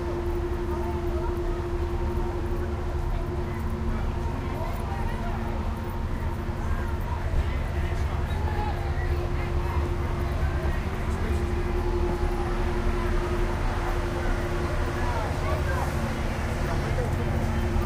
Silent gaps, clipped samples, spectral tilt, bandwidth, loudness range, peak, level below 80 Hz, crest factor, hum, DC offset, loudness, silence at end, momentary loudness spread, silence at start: none; under 0.1%; -7 dB/octave; 16 kHz; 2 LU; -14 dBFS; -30 dBFS; 14 dB; none; under 0.1%; -29 LUFS; 0 s; 3 LU; 0 s